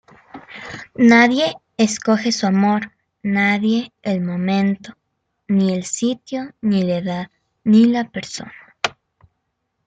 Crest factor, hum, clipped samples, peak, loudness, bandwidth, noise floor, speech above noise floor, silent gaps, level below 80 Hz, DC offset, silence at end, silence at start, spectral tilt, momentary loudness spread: 18 dB; none; under 0.1%; -2 dBFS; -18 LUFS; 9.2 kHz; -73 dBFS; 56 dB; none; -60 dBFS; under 0.1%; 0.95 s; 0.35 s; -5 dB/octave; 18 LU